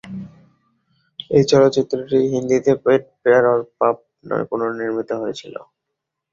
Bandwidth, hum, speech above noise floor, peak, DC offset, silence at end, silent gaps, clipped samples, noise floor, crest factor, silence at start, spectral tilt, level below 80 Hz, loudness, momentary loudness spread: 7.6 kHz; none; 62 dB; -2 dBFS; under 0.1%; 0.7 s; none; under 0.1%; -80 dBFS; 18 dB; 0.05 s; -6 dB/octave; -56 dBFS; -18 LUFS; 20 LU